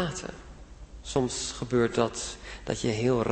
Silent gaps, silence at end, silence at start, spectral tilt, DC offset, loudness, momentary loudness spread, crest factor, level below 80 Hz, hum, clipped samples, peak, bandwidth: none; 0 s; 0 s; -5 dB/octave; under 0.1%; -29 LUFS; 21 LU; 22 dB; -48 dBFS; none; under 0.1%; -8 dBFS; 8.8 kHz